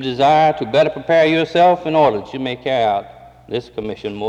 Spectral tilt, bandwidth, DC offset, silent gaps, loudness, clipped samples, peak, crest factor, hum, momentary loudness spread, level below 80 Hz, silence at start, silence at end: -6 dB/octave; 8.8 kHz; under 0.1%; none; -16 LUFS; under 0.1%; -4 dBFS; 12 dB; none; 13 LU; -52 dBFS; 0 s; 0 s